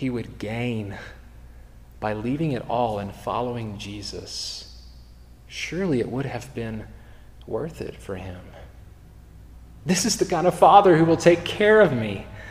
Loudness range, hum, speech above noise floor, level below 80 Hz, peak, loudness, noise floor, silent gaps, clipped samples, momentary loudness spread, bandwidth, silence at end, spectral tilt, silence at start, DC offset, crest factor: 14 LU; none; 24 dB; -46 dBFS; -2 dBFS; -22 LUFS; -47 dBFS; none; under 0.1%; 19 LU; 15.5 kHz; 0 s; -5 dB/octave; 0 s; 0.1%; 22 dB